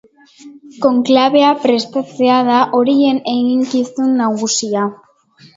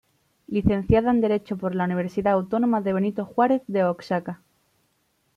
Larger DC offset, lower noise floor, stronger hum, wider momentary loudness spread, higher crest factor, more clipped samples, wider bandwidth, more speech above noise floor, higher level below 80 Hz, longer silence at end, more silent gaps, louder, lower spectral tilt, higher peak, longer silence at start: neither; second, -47 dBFS vs -69 dBFS; neither; about the same, 6 LU vs 8 LU; about the same, 14 dB vs 18 dB; neither; about the same, 7.8 kHz vs 7.2 kHz; second, 33 dB vs 47 dB; second, -62 dBFS vs -44 dBFS; second, 0.6 s vs 1 s; neither; first, -14 LUFS vs -23 LUFS; second, -4 dB/octave vs -9 dB/octave; first, 0 dBFS vs -6 dBFS; about the same, 0.45 s vs 0.5 s